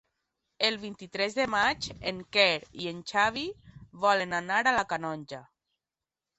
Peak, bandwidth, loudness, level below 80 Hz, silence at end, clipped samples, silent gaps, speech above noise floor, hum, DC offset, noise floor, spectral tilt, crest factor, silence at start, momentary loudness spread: -10 dBFS; 8.4 kHz; -28 LUFS; -62 dBFS; 0.95 s; under 0.1%; none; over 61 dB; none; under 0.1%; under -90 dBFS; -3 dB/octave; 22 dB; 0.6 s; 14 LU